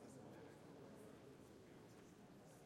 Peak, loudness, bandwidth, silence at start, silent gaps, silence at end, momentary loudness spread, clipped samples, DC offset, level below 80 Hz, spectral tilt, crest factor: -48 dBFS; -62 LUFS; 16 kHz; 0 s; none; 0 s; 4 LU; under 0.1%; under 0.1%; -84 dBFS; -5.5 dB/octave; 14 dB